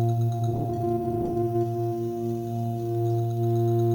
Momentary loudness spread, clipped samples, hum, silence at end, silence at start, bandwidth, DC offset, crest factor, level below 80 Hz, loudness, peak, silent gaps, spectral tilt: 5 LU; under 0.1%; none; 0 s; 0 s; 17.5 kHz; under 0.1%; 10 dB; -52 dBFS; -27 LUFS; -16 dBFS; none; -10 dB/octave